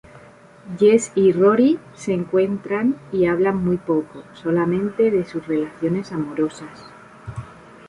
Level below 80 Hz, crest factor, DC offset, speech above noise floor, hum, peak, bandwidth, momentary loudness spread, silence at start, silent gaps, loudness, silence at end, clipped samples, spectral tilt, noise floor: -54 dBFS; 16 dB; under 0.1%; 26 dB; none; -4 dBFS; 11 kHz; 20 LU; 0.15 s; none; -20 LUFS; 0.35 s; under 0.1%; -7 dB/octave; -46 dBFS